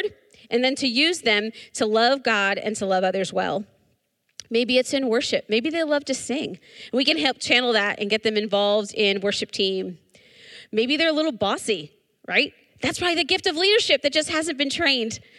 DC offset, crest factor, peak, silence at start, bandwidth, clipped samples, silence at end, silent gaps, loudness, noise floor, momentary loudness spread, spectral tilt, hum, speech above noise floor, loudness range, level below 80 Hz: under 0.1%; 20 dB; -4 dBFS; 0 s; 13 kHz; under 0.1%; 0.2 s; none; -22 LUFS; -70 dBFS; 9 LU; -3 dB/octave; none; 47 dB; 3 LU; -64 dBFS